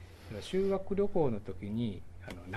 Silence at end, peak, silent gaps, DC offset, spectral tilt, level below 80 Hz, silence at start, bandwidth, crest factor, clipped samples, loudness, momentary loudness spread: 0 s; -18 dBFS; none; under 0.1%; -7.5 dB/octave; -52 dBFS; 0 s; 13 kHz; 16 dB; under 0.1%; -34 LUFS; 15 LU